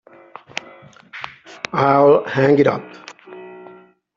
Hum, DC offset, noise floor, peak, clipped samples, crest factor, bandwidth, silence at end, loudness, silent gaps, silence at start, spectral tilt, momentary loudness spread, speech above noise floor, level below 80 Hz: none; under 0.1%; -45 dBFS; -2 dBFS; under 0.1%; 18 dB; 7.4 kHz; 0.55 s; -15 LUFS; none; 1.15 s; -7 dB/octave; 25 LU; 31 dB; -62 dBFS